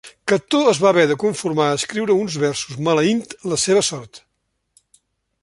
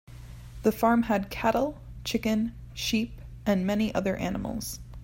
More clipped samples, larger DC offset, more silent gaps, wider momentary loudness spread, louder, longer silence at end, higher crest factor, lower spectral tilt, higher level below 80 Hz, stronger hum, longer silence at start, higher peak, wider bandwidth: neither; neither; neither; second, 8 LU vs 12 LU; first, -18 LUFS vs -28 LUFS; first, 1.25 s vs 0 s; about the same, 18 dB vs 18 dB; second, -4 dB/octave vs -5.5 dB/octave; second, -60 dBFS vs -46 dBFS; neither; about the same, 0.05 s vs 0.1 s; first, -2 dBFS vs -10 dBFS; second, 11.5 kHz vs 16.5 kHz